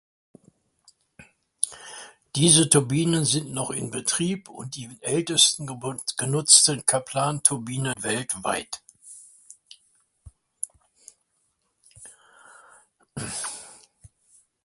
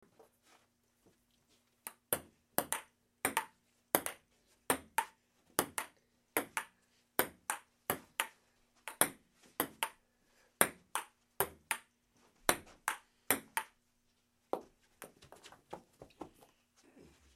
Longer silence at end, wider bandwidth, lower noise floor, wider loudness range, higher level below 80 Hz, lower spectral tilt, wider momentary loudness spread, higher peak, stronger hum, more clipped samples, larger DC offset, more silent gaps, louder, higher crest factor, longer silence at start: second, 0.9 s vs 1.05 s; second, 12 kHz vs 16.5 kHz; second, -72 dBFS vs -77 dBFS; first, 23 LU vs 5 LU; first, -62 dBFS vs -72 dBFS; first, -3 dB/octave vs -1.5 dB/octave; about the same, 21 LU vs 20 LU; first, 0 dBFS vs -4 dBFS; neither; neither; neither; neither; first, -22 LUFS vs -38 LUFS; second, 26 dB vs 38 dB; second, 1.2 s vs 1.85 s